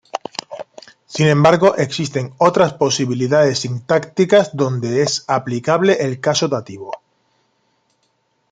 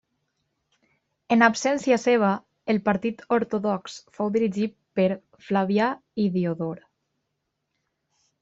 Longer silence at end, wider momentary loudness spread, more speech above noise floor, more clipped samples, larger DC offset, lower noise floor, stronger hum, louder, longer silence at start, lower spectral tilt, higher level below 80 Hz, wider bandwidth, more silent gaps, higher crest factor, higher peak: about the same, 1.55 s vs 1.65 s; first, 17 LU vs 11 LU; second, 49 dB vs 56 dB; neither; neither; second, -65 dBFS vs -79 dBFS; neither; first, -16 LUFS vs -24 LUFS; second, 0.15 s vs 1.3 s; about the same, -5 dB/octave vs -6 dB/octave; first, -58 dBFS vs -66 dBFS; first, 9.4 kHz vs 8 kHz; neither; second, 16 dB vs 22 dB; about the same, 0 dBFS vs -2 dBFS